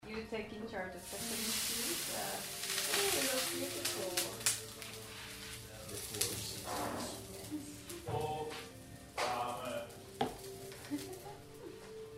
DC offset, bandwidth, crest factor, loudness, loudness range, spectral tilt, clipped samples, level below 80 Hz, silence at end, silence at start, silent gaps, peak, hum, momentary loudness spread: under 0.1%; 16 kHz; 28 dB; -38 LUFS; 7 LU; -2 dB/octave; under 0.1%; -64 dBFS; 0 s; 0 s; none; -12 dBFS; none; 14 LU